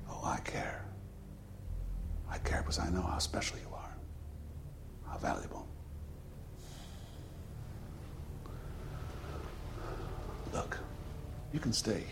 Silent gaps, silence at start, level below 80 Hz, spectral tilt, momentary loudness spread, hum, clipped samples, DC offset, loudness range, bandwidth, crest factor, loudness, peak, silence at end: none; 0 s; -46 dBFS; -4.5 dB/octave; 15 LU; none; under 0.1%; under 0.1%; 9 LU; 16.5 kHz; 20 dB; -41 LUFS; -20 dBFS; 0 s